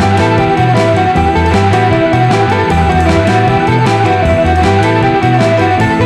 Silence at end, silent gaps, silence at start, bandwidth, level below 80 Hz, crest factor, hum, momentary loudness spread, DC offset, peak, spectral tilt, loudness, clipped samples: 0 s; none; 0 s; 12 kHz; -24 dBFS; 10 dB; none; 1 LU; under 0.1%; 0 dBFS; -7 dB/octave; -10 LUFS; under 0.1%